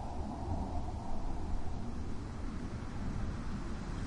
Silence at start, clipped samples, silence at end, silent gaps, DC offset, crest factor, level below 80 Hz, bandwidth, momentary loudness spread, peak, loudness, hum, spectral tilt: 0 s; under 0.1%; 0 s; none; under 0.1%; 12 dB; -40 dBFS; 10.5 kHz; 3 LU; -24 dBFS; -42 LUFS; none; -7 dB/octave